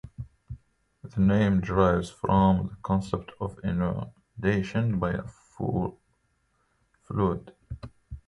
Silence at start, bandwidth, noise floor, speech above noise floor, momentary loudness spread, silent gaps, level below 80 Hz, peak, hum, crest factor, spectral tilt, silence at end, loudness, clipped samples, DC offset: 0.05 s; 11 kHz; -71 dBFS; 45 dB; 21 LU; none; -44 dBFS; -8 dBFS; none; 20 dB; -8.5 dB/octave; 0.1 s; -27 LUFS; under 0.1%; under 0.1%